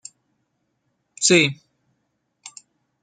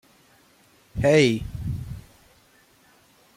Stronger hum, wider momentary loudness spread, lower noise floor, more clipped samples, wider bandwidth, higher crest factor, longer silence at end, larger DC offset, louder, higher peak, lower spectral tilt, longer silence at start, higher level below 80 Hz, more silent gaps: neither; first, 26 LU vs 21 LU; first, -73 dBFS vs -58 dBFS; neither; second, 9.6 kHz vs 16 kHz; about the same, 24 dB vs 22 dB; second, 0.55 s vs 1.35 s; neither; first, -17 LUFS vs -22 LUFS; first, -2 dBFS vs -6 dBFS; second, -3 dB/octave vs -6 dB/octave; first, 1.2 s vs 0.95 s; second, -66 dBFS vs -44 dBFS; neither